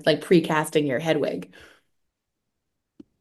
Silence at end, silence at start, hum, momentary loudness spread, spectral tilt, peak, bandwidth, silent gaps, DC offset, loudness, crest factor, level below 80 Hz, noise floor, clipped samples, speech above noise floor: 1.75 s; 0 s; none; 13 LU; -5.5 dB/octave; -6 dBFS; 12.5 kHz; none; under 0.1%; -22 LUFS; 20 dB; -68 dBFS; -81 dBFS; under 0.1%; 58 dB